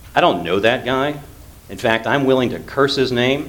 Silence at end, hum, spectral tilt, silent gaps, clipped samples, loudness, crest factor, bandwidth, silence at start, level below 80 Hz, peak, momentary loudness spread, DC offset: 0 s; none; -5.5 dB/octave; none; under 0.1%; -17 LUFS; 18 dB; 19 kHz; 0 s; -44 dBFS; 0 dBFS; 7 LU; under 0.1%